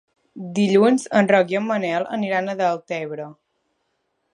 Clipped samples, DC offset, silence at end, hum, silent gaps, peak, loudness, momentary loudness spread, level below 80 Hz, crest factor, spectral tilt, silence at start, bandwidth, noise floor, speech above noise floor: under 0.1%; under 0.1%; 1 s; none; none; -2 dBFS; -20 LUFS; 15 LU; -74 dBFS; 20 dB; -6 dB/octave; 0.35 s; 11 kHz; -72 dBFS; 52 dB